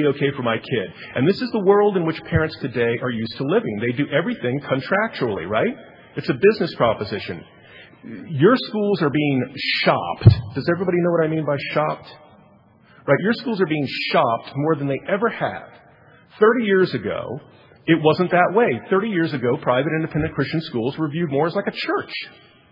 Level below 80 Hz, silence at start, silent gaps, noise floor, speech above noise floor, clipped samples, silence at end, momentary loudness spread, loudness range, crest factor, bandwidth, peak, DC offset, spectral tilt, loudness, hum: -50 dBFS; 0 s; none; -52 dBFS; 32 dB; under 0.1%; 0.4 s; 11 LU; 3 LU; 20 dB; 5.6 kHz; 0 dBFS; under 0.1%; -9 dB/octave; -20 LUFS; none